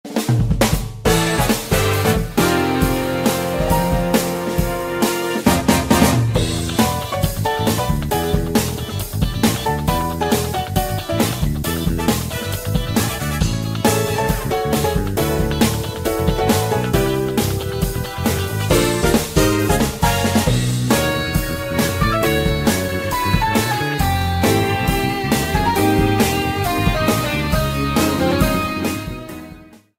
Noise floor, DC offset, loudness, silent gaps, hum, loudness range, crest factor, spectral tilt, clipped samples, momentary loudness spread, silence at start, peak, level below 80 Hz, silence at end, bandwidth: -41 dBFS; under 0.1%; -18 LUFS; none; none; 2 LU; 16 dB; -5 dB/octave; under 0.1%; 5 LU; 0.05 s; -2 dBFS; -28 dBFS; 0.35 s; 16.5 kHz